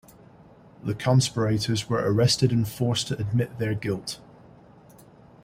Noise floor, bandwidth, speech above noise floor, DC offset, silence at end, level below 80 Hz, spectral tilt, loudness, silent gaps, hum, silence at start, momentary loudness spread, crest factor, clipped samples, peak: -51 dBFS; 16 kHz; 27 dB; under 0.1%; 1.3 s; -54 dBFS; -5.5 dB/octave; -25 LUFS; none; none; 0.85 s; 11 LU; 20 dB; under 0.1%; -6 dBFS